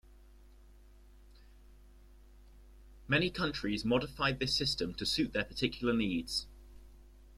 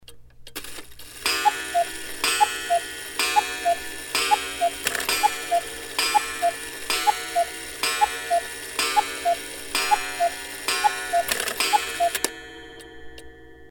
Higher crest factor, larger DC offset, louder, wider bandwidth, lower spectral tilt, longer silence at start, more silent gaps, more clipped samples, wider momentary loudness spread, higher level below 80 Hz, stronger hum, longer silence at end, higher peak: about the same, 22 dB vs 22 dB; neither; second, -33 LUFS vs -24 LUFS; second, 14 kHz vs over 20 kHz; first, -4.5 dB/octave vs 0 dB/octave; about the same, 0.1 s vs 0.1 s; neither; neither; second, 5 LU vs 14 LU; about the same, -54 dBFS vs -54 dBFS; neither; about the same, 0.05 s vs 0 s; second, -16 dBFS vs -2 dBFS